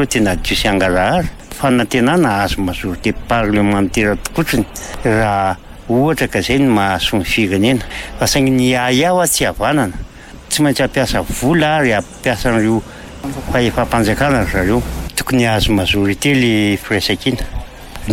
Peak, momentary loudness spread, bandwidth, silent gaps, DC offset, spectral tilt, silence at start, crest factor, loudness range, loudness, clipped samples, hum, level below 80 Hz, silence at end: -2 dBFS; 8 LU; 16.5 kHz; none; under 0.1%; -4.5 dB/octave; 0 s; 12 dB; 2 LU; -15 LUFS; under 0.1%; none; -30 dBFS; 0 s